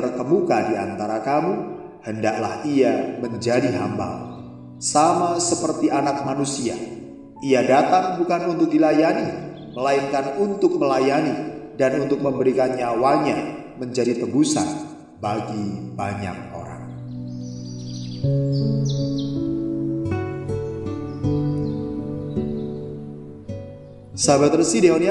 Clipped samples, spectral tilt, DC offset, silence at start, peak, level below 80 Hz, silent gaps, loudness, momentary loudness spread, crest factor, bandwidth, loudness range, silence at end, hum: under 0.1%; -5.5 dB/octave; under 0.1%; 0 s; -2 dBFS; -50 dBFS; none; -22 LUFS; 16 LU; 20 dB; 11.5 kHz; 7 LU; 0 s; none